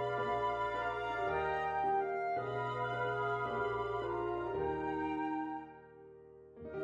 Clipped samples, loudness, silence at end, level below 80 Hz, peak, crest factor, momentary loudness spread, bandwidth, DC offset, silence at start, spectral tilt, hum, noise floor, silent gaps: under 0.1%; -37 LUFS; 0 s; -60 dBFS; -24 dBFS; 14 dB; 18 LU; 8.8 kHz; under 0.1%; 0 s; -7 dB/octave; none; -56 dBFS; none